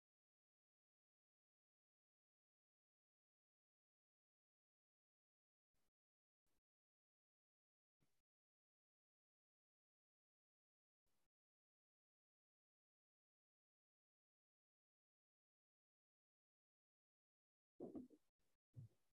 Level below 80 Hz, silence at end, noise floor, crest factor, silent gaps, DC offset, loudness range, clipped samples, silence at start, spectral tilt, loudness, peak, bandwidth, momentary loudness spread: under -90 dBFS; 0.25 s; under -90 dBFS; 30 dB; 18.29-18.39 s, 18.55-18.73 s; under 0.1%; 1 LU; under 0.1%; 17.8 s; -2 dB/octave; -61 LUFS; -44 dBFS; 0.8 kHz; 10 LU